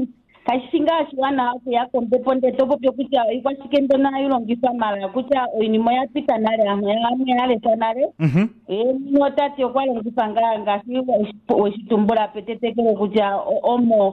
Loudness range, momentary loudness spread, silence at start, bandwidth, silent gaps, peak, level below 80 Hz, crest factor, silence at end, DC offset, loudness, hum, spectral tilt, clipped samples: 1 LU; 4 LU; 0 s; 6 kHz; none; -6 dBFS; -58 dBFS; 12 dB; 0 s; under 0.1%; -20 LUFS; none; -8.5 dB/octave; under 0.1%